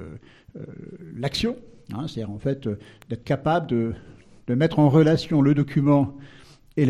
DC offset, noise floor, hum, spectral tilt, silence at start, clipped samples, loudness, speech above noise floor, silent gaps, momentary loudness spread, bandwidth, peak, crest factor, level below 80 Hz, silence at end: under 0.1%; -43 dBFS; none; -8 dB/octave; 0 s; under 0.1%; -23 LUFS; 20 dB; none; 21 LU; 10.5 kHz; -6 dBFS; 18 dB; -50 dBFS; 0 s